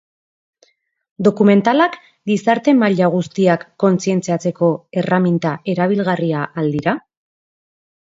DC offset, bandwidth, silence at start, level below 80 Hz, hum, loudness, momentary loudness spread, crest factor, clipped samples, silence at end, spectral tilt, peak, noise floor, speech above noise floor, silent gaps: under 0.1%; 7.8 kHz; 1.2 s; -60 dBFS; none; -17 LUFS; 7 LU; 16 dB; under 0.1%; 1.1 s; -7 dB/octave; 0 dBFS; -58 dBFS; 43 dB; none